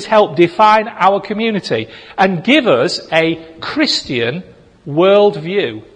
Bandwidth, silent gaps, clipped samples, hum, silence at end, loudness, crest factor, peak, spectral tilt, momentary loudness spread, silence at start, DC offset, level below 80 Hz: 10.5 kHz; none; under 0.1%; none; 0.15 s; -14 LUFS; 14 dB; 0 dBFS; -5 dB/octave; 10 LU; 0 s; under 0.1%; -54 dBFS